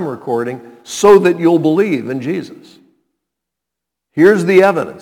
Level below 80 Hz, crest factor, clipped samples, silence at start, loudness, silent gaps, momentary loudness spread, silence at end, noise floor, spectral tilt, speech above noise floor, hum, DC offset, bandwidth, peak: -56 dBFS; 14 dB; 0.3%; 0 s; -12 LUFS; none; 15 LU; 0.05 s; -81 dBFS; -6 dB/octave; 69 dB; none; under 0.1%; 17 kHz; 0 dBFS